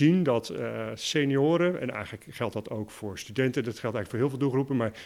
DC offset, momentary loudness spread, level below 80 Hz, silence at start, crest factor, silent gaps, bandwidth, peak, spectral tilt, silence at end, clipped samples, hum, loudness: under 0.1%; 12 LU; -64 dBFS; 0 s; 16 dB; none; 15.5 kHz; -12 dBFS; -6 dB/octave; 0 s; under 0.1%; none; -29 LUFS